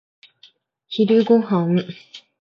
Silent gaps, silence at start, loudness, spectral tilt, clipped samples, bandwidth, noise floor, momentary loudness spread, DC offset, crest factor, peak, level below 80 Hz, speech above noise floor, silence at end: none; 0.9 s; -18 LUFS; -8.5 dB/octave; under 0.1%; 6.8 kHz; -54 dBFS; 18 LU; under 0.1%; 16 dB; -4 dBFS; -70 dBFS; 36 dB; 0.25 s